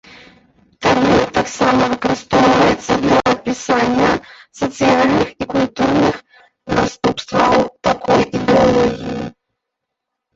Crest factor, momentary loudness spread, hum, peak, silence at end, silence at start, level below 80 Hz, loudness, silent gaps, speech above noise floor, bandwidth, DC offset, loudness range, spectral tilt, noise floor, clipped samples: 14 dB; 8 LU; none; 0 dBFS; 1.05 s; 0.8 s; -42 dBFS; -15 LUFS; none; 64 dB; 8 kHz; under 0.1%; 2 LU; -5 dB/octave; -78 dBFS; under 0.1%